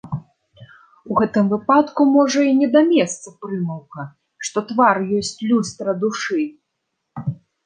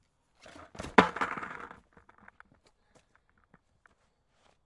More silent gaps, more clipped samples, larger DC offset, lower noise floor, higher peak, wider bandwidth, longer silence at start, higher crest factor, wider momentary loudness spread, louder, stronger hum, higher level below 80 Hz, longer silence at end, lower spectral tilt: neither; neither; neither; first, -76 dBFS vs -72 dBFS; about the same, -2 dBFS vs -2 dBFS; second, 9.8 kHz vs 11.5 kHz; second, 0.05 s vs 0.6 s; second, 18 dB vs 34 dB; second, 16 LU vs 26 LU; first, -19 LUFS vs -28 LUFS; neither; about the same, -60 dBFS vs -64 dBFS; second, 0.3 s vs 2.95 s; about the same, -5.5 dB/octave vs -5 dB/octave